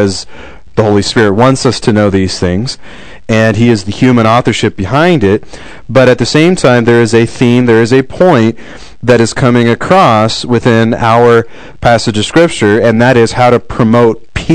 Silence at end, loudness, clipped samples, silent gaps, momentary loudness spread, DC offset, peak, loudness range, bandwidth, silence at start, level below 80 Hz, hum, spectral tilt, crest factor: 0 s; -8 LUFS; 5%; none; 7 LU; 3%; 0 dBFS; 2 LU; 12 kHz; 0 s; -36 dBFS; none; -6 dB/octave; 8 dB